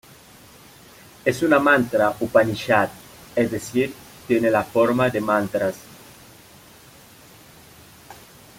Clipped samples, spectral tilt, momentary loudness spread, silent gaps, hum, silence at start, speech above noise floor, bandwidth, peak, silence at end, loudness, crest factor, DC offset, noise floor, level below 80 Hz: under 0.1%; -5.5 dB/octave; 10 LU; none; none; 1.25 s; 28 dB; 16.5 kHz; -2 dBFS; 0.45 s; -21 LUFS; 20 dB; under 0.1%; -48 dBFS; -58 dBFS